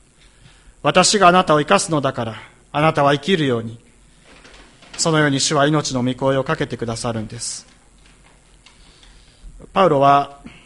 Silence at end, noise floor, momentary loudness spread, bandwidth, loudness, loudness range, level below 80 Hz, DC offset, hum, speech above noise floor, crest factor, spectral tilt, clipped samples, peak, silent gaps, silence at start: 0.15 s; -50 dBFS; 15 LU; 11.5 kHz; -17 LUFS; 9 LU; -48 dBFS; under 0.1%; none; 33 dB; 18 dB; -4 dB/octave; under 0.1%; 0 dBFS; none; 0.85 s